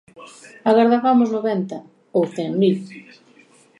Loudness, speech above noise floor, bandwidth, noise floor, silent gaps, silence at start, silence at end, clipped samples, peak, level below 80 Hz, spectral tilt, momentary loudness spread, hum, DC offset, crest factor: -19 LUFS; 33 dB; 10.5 kHz; -52 dBFS; none; 0.2 s; 0.8 s; under 0.1%; -2 dBFS; -74 dBFS; -7.5 dB/octave; 14 LU; none; under 0.1%; 18 dB